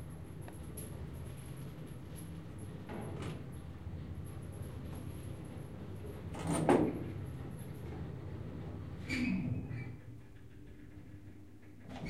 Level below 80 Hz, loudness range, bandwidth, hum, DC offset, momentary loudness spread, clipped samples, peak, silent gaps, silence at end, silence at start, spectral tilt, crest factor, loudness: -56 dBFS; 8 LU; 16 kHz; none; 0.2%; 18 LU; under 0.1%; -14 dBFS; none; 0 s; 0 s; -6.5 dB/octave; 26 dB; -41 LUFS